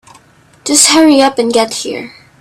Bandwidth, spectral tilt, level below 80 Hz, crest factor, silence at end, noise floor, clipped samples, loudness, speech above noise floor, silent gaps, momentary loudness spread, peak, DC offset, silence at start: over 20 kHz; -1.5 dB/octave; -54 dBFS; 12 dB; 0.3 s; -45 dBFS; 0.2%; -9 LUFS; 35 dB; none; 17 LU; 0 dBFS; under 0.1%; 0.65 s